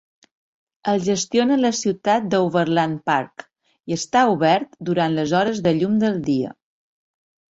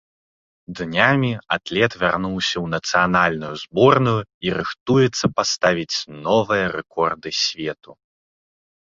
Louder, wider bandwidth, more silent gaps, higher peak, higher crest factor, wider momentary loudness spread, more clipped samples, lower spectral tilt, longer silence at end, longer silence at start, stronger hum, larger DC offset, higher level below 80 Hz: about the same, -20 LUFS vs -20 LUFS; about the same, 8 kHz vs 7.8 kHz; second, none vs 4.34-4.41 s, 4.80-4.86 s; about the same, -4 dBFS vs -2 dBFS; about the same, 18 dB vs 20 dB; second, 6 LU vs 9 LU; neither; about the same, -5 dB/octave vs -4.5 dB/octave; about the same, 1.05 s vs 1.05 s; first, 0.85 s vs 0.7 s; neither; neither; second, -60 dBFS vs -52 dBFS